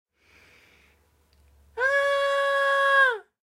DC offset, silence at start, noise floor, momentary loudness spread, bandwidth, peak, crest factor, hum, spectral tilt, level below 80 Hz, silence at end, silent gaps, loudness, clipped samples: under 0.1%; 1.75 s; -63 dBFS; 6 LU; 15 kHz; -10 dBFS; 16 dB; none; 0 dB/octave; -64 dBFS; 0.3 s; none; -22 LUFS; under 0.1%